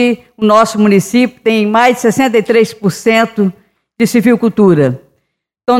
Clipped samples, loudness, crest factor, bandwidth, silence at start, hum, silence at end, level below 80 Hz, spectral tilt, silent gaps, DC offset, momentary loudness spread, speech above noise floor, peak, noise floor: under 0.1%; -11 LUFS; 10 dB; 16 kHz; 0 s; none; 0 s; -54 dBFS; -5.5 dB/octave; none; under 0.1%; 6 LU; 56 dB; 0 dBFS; -66 dBFS